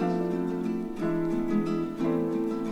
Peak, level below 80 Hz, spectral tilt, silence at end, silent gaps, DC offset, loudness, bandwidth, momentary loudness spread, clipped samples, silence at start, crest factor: -16 dBFS; -54 dBFS; -8.5 dB/octave; 0 s; none; under 0.1%; -29 LUFS; 12.5 kHz; 3 LU; under 0.1%; 0 s; 12 dB